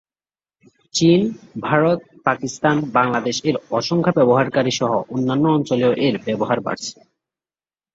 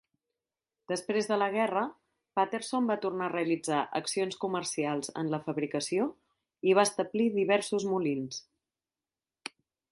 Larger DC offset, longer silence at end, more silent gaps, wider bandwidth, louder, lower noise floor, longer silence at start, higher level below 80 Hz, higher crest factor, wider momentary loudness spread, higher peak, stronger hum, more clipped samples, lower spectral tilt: neither; first, 1 s vs 0.45 s; neither; second, 8 kHz vs 11.5 kHz; first, -19 LUFS vs -31 LUFS; about the same, under -90 dBFS vs under -90 dBFS; about the same, 0.95 s vs 0.9 s; first, -58 dBFS vs -76 dBFS; about the same, 18 dB vs 20 dB; about the same, 7 LU vs 9 LU; first, -2 dBFS vs -12 dBFS; neither; neither; about the same, -5.5 dB/octave vs -4.5 dB/octave